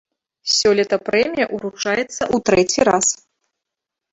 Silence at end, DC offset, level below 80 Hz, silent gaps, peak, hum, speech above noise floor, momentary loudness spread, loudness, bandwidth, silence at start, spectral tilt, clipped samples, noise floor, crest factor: 1 s; under 0.1%; -52 dBFS; none; -2 dBFS; none; 66 dB; 8 LU; -18 LUFS; 8 kHz; 0.45 s; -2.5 dB/octave; under 0.1%; -83 dBFS; 18 dB